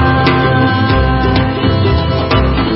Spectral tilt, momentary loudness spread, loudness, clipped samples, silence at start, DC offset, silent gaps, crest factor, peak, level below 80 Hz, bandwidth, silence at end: -9.5 dB/octave; 2 LU; -12 LUFS; under 0.1%; 0 s; under 0.1%; none; 10 dB; 0 dBFS; -20 dBFS; 5.8 kHz; 0 s